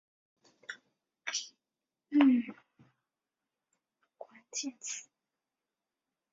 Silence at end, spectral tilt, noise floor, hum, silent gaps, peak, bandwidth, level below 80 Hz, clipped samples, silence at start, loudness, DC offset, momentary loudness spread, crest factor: 1.3 s; -2 dB/octave; under -90 dBFS; none; none; -14 dBFS; 7.6 kHz; -86 dBFS; under 0.1%; 0.7 s; -32 LUFS; under 0.1%; 25 LU; 24 dB